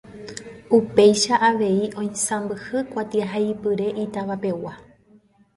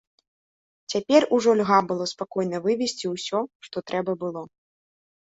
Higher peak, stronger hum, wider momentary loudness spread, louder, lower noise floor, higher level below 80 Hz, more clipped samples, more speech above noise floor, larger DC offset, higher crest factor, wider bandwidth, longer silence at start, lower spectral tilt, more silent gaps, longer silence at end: about the same, -2 dBFS vs -4 dBFS; neither; first, 17 LU vs 14 LU; first, -21 LUFS vs -24 LUFS; second, -55 dBFS vs under -90 dBFS; first, -60 dBFS vs -70 dBFS; neither; second, 34 dB vs over 66 dB; neither; about the same, 20 dB vs 20 dB; first, 11.5 kHz vs 8 kHz; second, 0.05 s vs 0.9 s; about the same, -4 dB/octave vs -4.5 dB/octave; second, none vs 3.55-3.60 s; about the same, 0.75 s vs 0.75 s